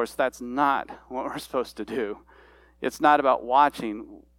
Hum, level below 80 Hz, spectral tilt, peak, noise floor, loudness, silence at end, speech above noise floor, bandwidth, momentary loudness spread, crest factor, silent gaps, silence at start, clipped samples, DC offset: none; -58 dBFS; -4.5 dB/octave; -6 dBFS; -54 dBFS; -25 LUFS; 0.2 s; 29 dB; 17 kHz; 14 LU; 20 dB; none; 0 s; under 0.1%; under 0.1%